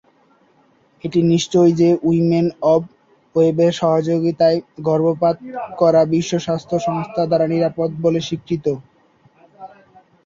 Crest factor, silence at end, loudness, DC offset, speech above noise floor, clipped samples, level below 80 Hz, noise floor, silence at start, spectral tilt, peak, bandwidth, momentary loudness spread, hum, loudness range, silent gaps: 16 dB; 0.6 s; -17 LUFS; under 0.1%; 40 dB; under 0.1%; -56 dBFS; -56 dBFS; 1.05 s; -7 dB/octave; -2 dBFS; 7.8 kHz; 8 LU; none; 5 LU; none